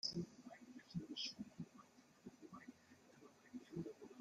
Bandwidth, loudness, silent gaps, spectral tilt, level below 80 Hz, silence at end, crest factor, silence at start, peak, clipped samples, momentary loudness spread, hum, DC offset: 14 kHz; -53 LUFS; none; -4.5 dB/octave; -80 dBFS; 0 s; 22 dB; 0.05 s; -30 dBFS; under 0.1%; 19 LU; none; under 0.1%